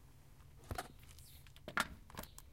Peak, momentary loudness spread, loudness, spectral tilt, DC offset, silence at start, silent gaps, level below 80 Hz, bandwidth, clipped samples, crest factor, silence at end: -18 dBFS; 22 LU; -45 LUFS; -3 dB/octave; under 0.1%; 0 s; none; -60 dBFS; 16.5 kHz; under 0.1%; 30 dB; 0 s